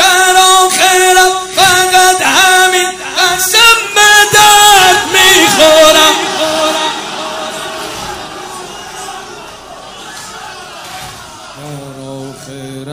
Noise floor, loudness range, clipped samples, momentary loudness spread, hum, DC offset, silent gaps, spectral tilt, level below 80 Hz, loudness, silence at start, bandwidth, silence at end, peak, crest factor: -29 dBFS; 21 LU; 1%; 22 LU; none; under 0.1%; none; -0.5 dB/octave; -42 dBFS; -6 LUFS; 0 s; over 20 kHz; 0 s; 0 dBFS; 10 dB